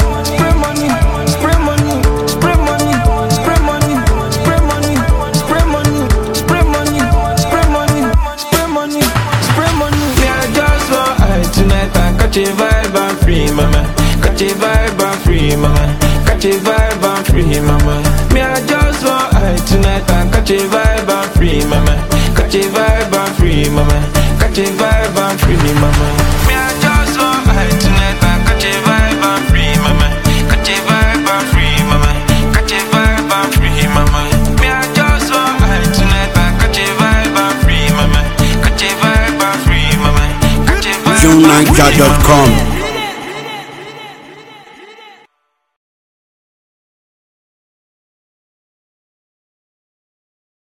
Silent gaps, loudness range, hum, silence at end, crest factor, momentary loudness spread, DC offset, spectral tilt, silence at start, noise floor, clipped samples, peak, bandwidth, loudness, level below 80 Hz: none; 3 LU; none; 5.8 s; 10 dB; 3 LU; under 0.1%; -5 dB/octave; 0 s; -66 dBFS; 0.2%; 0 dBFS; 18.5 kHz; -12 LUFS; -16 dBFS